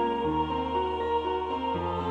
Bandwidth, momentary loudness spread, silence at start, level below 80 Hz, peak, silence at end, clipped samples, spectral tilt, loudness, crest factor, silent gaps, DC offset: 8.4 kHz; 2 LU; 0 s; -46 dBFS; -18 dBFS; 0 s; under 0.1%; -7.5 dB/octave; -29 LUFS; 12 dB; none; under 0.1%